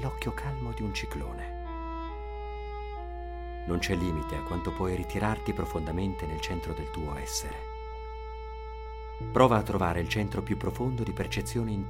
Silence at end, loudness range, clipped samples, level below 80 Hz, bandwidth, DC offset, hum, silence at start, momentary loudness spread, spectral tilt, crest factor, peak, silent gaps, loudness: 0 s; 7 LU; under 0.1%; -40 dBFS; 16 kHz; under 0.1%; none; 0 s; 12 LU; -5.5 dB/octave; 24 dB; -8 dBFS; none; -32 LUFS